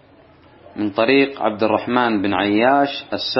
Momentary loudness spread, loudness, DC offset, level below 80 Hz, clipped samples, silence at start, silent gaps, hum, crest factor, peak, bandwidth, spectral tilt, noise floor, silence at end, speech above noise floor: 8 LU; -18 LUFS; under 0.1%; -60 dBFS; under 0.1%; 0.75 s; none; none; 18 dB; 0 dBFS; 6 kHz; -8 dB/octave; -49 dBFS; 0 s; 31 dB